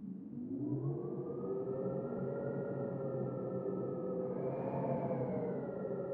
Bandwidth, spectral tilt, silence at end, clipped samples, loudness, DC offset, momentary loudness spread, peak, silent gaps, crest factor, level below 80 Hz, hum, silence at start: 3.2 kHz; -11.5 dB/octave; 0 s; under 0.1%; -40 LUFS; under 0.1%; 4 LU; -24 dBFS; none; 14 dB; -72 dBFS; none; 0 s